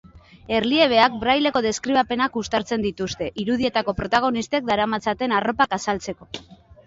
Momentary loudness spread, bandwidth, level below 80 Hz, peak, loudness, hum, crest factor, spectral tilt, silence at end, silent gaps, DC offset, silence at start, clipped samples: 10 LU; 8 kHz; -48 dBFS; -2 dBFS; -21 LUFS; none; 20 dB; -4 dB/octave; 0.3 s; none; under 0.1%; 0.15 s; under 0.1%